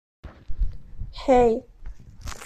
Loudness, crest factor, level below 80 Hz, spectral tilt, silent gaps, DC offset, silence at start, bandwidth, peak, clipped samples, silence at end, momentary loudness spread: -23 LUFS; 18 dB; -34 dBFS; -6.5 dB/octave; none; under 0.1%; 0.25 s; 13 kHz; -8 dBFS; under 0.1%; 0 s; 23 LU